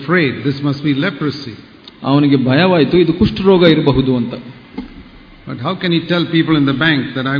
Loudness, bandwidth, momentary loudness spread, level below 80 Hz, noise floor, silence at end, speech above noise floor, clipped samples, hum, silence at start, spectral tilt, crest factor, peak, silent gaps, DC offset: -14 LUFS; 5.4 kHz; 19 LU; -40 dBFS; -38 dBFS; 0 s; 24 dB; under 0.1%; none; 0 s; -8.5 dB/octave; 14 dB; 0 dBFS; none; under 0.1%